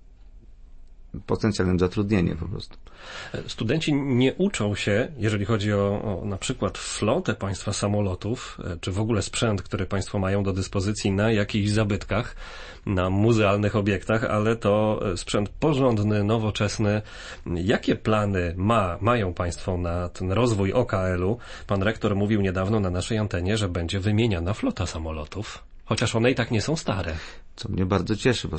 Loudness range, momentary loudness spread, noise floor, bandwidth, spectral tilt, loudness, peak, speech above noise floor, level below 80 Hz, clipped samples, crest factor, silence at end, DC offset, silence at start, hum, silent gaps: 3 LU; 11 LU; -46 dBFS; 8.8 kHz; -6 dB/octave; -25 LUFS; -8 dBFS; 22 dB; -42 dBFS; under 0.1%; 16 dB; 0 s; under 0.1%; 0.1 s; none; none